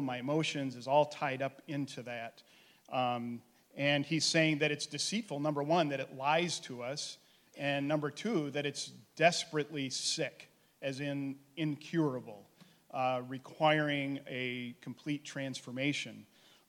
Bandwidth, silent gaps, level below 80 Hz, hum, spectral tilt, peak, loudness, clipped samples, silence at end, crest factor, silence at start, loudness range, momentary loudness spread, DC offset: 16.5 kHz; none; -82 dBFS; none; -4 dB/octave; -12 dBFS; -35 LUFS; under 0.1%; 0.45 s; 22 dB; 0 s; 4 LU; 14 LU; under 0.1%